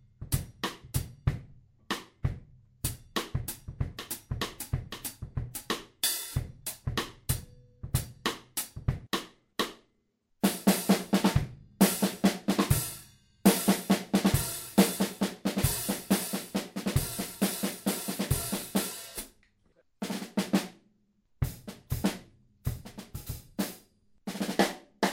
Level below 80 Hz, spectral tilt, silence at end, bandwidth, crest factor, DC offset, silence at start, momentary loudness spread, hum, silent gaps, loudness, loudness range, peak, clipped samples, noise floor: -46 dBFS; -4.5 dB/octave; 0 s; 16.5 kHz; 24 dB; under 0.1%; 0.2 s; 13 LU; none; none; -31 LUFS; 9 LU; -8 dBFS; under 0.1%; -74 dBFS